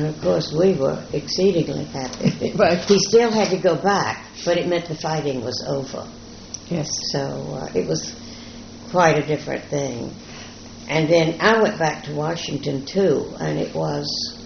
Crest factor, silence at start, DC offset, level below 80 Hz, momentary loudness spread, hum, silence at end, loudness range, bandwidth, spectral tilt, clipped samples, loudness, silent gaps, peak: 20 dB; 0 s; under 0.1%; -50 dBFS; 17 LU; none; 0 s; 7 LU; 6.6 kHz; -4.5 dB/octave; under 0.1%; -21 LUFS; none; -2 dBFS